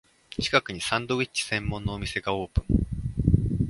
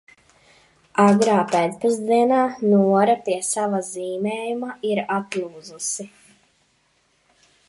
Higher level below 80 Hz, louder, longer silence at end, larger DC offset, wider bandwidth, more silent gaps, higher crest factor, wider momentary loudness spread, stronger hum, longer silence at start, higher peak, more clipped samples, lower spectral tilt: first, -34 dBFS vs -68 dBFS; second, -27 LUFS vs -21 LUFS; second, 0 s vs 1.6 s; neither; about the same, 11.5 kHz vs 11.5 kHz; neither; about the same, 22 dB vs 18 dB; second, 7 LU vs 12 LU; neither; second, 0.3 s vs 0.95 s; about the same, -4 dBFS vs -4 dBFS; neither; about the same, -5 dB/octave vs -5 dB/octave